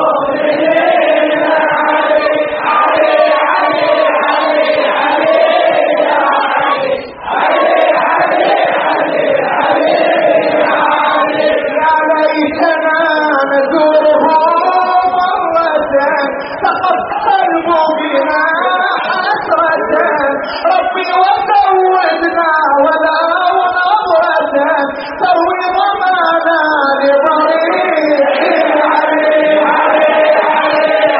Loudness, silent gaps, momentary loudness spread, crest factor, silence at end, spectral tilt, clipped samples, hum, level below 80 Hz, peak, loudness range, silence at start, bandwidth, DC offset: -11 LUFS; none; 3 LU; 10 dB; 0 s; -0.5 dB/octave; under 0.1%; none; -54 dBFS; 0 dBFS; 2 LU; 0 s; 5.8 kHz; under 0.1%